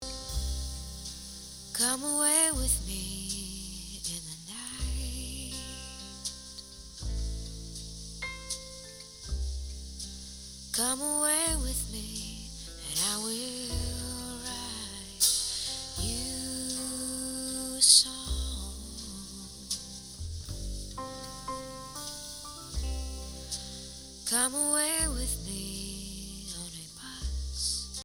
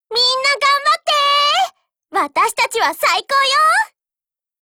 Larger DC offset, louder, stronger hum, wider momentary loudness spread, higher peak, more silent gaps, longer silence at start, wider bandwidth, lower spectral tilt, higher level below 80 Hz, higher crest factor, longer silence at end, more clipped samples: neither; second, -31 LUFS vs -14 LUFS; neither; first, 16 LU vs 7 LU; about the same, -6 dBFS vs -4 dBFS; neither; about the same, 0 s vs 0.1 s; about the same, over 20 kHz vs over 20 kHz; first, -2 dB/octave vs 1 dB/octave; first, -42 dBFS vs -66 dBFS; first, 28 dB vs 14 dB; second, 0 s vs 0.75 s; neither